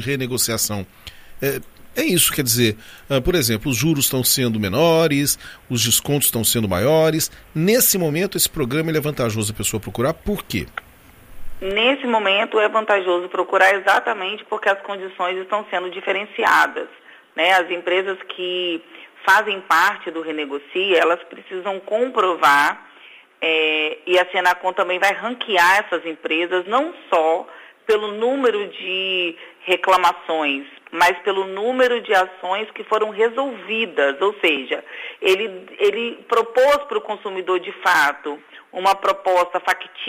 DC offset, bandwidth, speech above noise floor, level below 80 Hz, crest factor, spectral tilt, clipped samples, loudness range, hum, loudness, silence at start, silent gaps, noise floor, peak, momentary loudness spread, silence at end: under 0.1%; 15.5 kHz; 27 dB; -46 dBFS; 18 dB; -3 dB/octave; under 0.1%; 3 LU; none; -19 LUFS; 0 s; none; -46 dBFS; -2 dBFS; 11 LU; 0 s